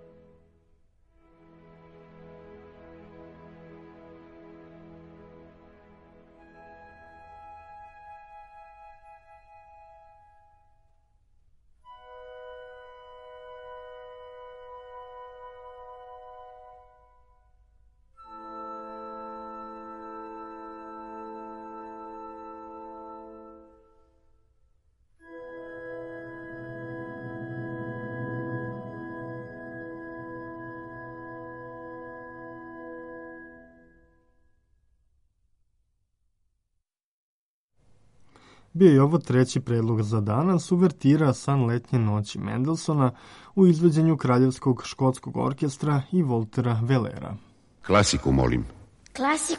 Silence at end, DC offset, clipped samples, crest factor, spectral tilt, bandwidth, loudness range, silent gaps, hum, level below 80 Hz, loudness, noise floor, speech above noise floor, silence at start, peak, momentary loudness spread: 0 s; under 0.1%; under 0.1%; 24 dB; -6.5 dB/octave; 11.5 kHz; 26 LU; 37.04-37.69 s; none; -52 dBFS; -25 LUFS; -80 dBFS; 57 dB; 2.25 s; -6 dBFS; 27 LU